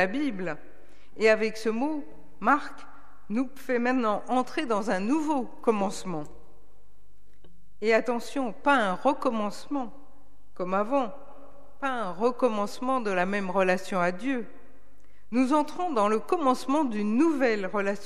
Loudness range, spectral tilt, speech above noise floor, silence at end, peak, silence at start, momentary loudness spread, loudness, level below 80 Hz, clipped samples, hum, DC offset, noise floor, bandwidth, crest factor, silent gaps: 3 LU; -5.5 dB/octave; 35 dB; 0 s; -8 dBFS; 0 s; 10 LU; -27 LUFS; -62 dBFS; under 0.1%; none; 2%; -62 dBFS; 14.5 kHz; 20 dB; none